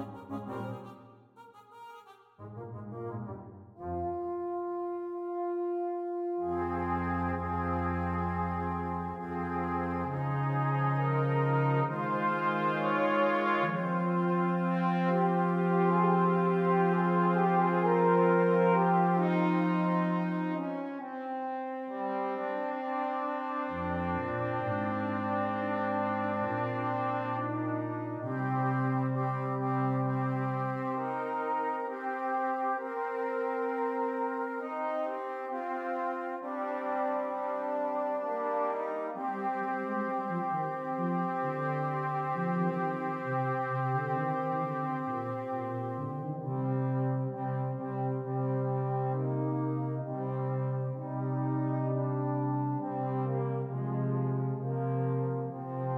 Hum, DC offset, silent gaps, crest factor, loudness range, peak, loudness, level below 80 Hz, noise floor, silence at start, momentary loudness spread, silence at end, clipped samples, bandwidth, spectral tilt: none; under 0.1%; none; 18 dB; 7 LU; -14 dBFS; -32 LUFS; -62 dBFS; -55 dBFS; 0 s; 9 LU; 0 s; under 0.1%; 5.6 kHz; -9.5 dB/octave